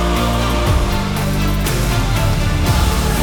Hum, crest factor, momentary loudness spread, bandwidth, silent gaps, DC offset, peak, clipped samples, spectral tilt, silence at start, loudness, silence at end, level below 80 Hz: none; 12 dB; 2 LU; over 20 kHz; none; under 0.1%; -4 dBFS; under 0.1%; -5 dB/octave; 0 s; -17 LUFS; 0 s; -20 dBFS